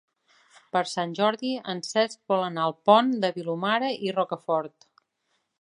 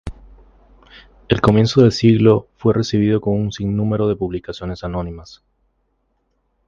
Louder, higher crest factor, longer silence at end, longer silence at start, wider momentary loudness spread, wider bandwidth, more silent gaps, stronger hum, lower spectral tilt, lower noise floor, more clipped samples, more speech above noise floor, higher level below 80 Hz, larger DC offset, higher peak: second, -26 LUFS vs -17 LUFS; about the same, 22 dB vs 18 dB; second, 0.95 s vs 1.45 s; first, 0.75 s vs 0.05 s; second, 10 LU vs 14 LU; first, 11 kHz vs 7.4 kHz; neither; neither; second, -4.5 dB/octave vs -7.5 dB/octave; first, -75 dBFS vs -67 dBFS; neither; about the same, 50 dB vs 50 dB; second, -80 dBFS vs -40 dBFS; neither; second, -4 dBFS vs 0 dBFS